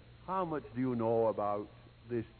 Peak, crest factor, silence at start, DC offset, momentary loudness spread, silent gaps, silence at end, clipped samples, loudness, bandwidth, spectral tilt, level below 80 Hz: -20 dBFS; 16 dB; 0.05 s; under 0.1%; 9 LU; none; 0.05 s; under 0.1%; -35 LUFS; 4.5 kHz; -7.5 dB/octave; -64 dBFS